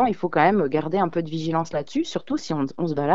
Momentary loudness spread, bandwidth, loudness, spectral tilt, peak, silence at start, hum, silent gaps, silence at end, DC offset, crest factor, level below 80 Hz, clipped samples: 8 LU; 7.8 kHz; -24 LUFS; -6.5 dB/octave; -4 dBFS; 0 s; none; none; 0 s; 0.9%; 20 dB; -56 dBFS; under 0.1%